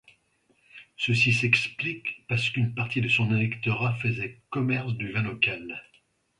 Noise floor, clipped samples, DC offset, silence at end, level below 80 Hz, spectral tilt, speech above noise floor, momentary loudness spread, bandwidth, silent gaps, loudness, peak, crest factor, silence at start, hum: -68 dBFS; under 0.1%; under 0.1%; 0.6 s; -60 dBFS; -5.5 dB/octave; 41 dB; 11 LU; 11 kHz; none; -26 LUFS; -6 dBFS; 22 dB; 0.75 s; none